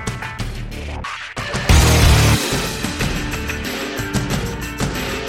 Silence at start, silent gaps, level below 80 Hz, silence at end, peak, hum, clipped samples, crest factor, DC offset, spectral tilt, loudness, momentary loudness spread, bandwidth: 0 s; none; -24 dBFS; 0 s; 0 dBFS; none; under 0.1%; 18 dB; 0.1%; -4.5 dB/octave; -19 LUFS; 15 LU; 16.5 kHz